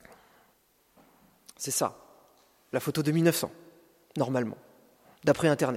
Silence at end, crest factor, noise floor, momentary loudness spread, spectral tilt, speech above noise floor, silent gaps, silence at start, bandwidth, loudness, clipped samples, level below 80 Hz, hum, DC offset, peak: 0 s; 22 dB; -67 dBFS; 13 LU; -5 dB/octave; 40 dB; none; 1.6 s; 16.5 kHz; -29 LUFS; under 0.1%; -68 dBFS; none; under 0.1%; -10 dBFS